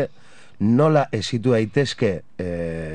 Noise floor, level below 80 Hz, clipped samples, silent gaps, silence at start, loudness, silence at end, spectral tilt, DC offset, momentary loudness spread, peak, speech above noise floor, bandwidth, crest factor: -51 dBFS; -50 dBFS; under 0.1%; none; 0 s; -21 LUFS; 0 s; -6.5 dB/octave; 0.9%; 12 LU; -6 dBFS; 31 dB; 10 kHz; 16 dB